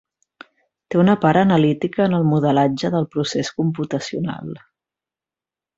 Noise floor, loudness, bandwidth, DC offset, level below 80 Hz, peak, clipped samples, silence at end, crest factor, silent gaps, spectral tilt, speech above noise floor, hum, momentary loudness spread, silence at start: -90 dBFS; -19 LUFS; 7.8 kHz; under 0.1%; -56 dBFS; -2 dBFS; under 0.1%; 1.2 s; 18 dB; none; -7 dB/octave; 72 dB; none; 11 LU; 0.9 s